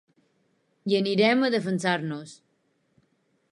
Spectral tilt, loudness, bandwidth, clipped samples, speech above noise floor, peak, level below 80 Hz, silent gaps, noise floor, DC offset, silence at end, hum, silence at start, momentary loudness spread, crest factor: -5.5 dB/octave; -24 LUFS; 11.5 kHz; under 0.1%; 46 dB; -8 dBFS; -78 dBFS; none; -71 dBFS; under 0.1%; 1.15 s; none; 0.85 s; 16 LU; 20 dB